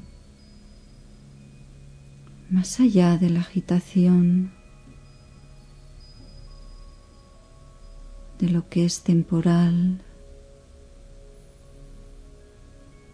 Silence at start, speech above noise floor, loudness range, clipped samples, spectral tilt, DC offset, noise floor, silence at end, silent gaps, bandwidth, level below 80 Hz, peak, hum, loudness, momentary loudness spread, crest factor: 2.5 s; 29 dB; 8 LU; under 0.1%; -7 dB/octave; under 0.1%; -49 dBFS; 0.9 s; none; 11 kHz; -48 dBFS; -6 dBFS; none; -21 LUFS; 8 LU; 18 dB